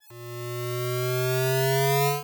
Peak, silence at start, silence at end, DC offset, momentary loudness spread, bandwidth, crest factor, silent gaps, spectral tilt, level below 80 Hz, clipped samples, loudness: -10 dBFS; 0.1 s; 0 s; under 0.1%; 13 LU; over 20 kHz; 16 dB; none; -5 dB/octave; -82 dBFS; under 0.1%; -25 LUFS